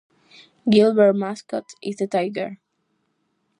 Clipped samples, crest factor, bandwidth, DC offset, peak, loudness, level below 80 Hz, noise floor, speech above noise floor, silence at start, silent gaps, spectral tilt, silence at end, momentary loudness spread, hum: under 0.1%; 18 dB; 10.5 kHz; under 0.1%; -4 dBFS; -20 LUFS; -70 dBFS; -71 dBFS; 51 dB; 0.65 s; none; -6.5 dB/octave; 1.05 s; 15 LU; none